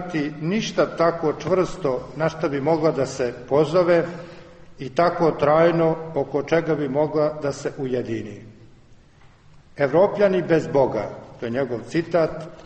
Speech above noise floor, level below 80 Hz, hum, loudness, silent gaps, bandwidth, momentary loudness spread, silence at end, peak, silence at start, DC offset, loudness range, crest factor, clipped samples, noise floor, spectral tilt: 29 dB; -52 dBFS; none; -22 LUFS; none; 8.4 kHz; 10 LU; 0 s; -6 dBFS; 0 s; under 0.1%; 4 LU; 16 dB; under 0.1%; -50 dBFS; -6.5 dB/octave